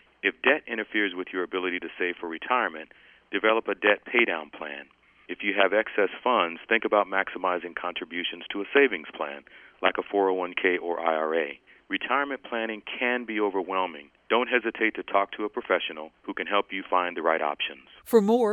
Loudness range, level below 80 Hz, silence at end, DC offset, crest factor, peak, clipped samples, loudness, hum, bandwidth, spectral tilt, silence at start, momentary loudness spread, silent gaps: 2 LU; -72 dBFS; 0 s; under 0.1%; 22 dB; -6 dBFS; under 0.1%; -26 LUFS; none; 11 kHz; -5 dB/octave; 0.25 s; 11 LU; none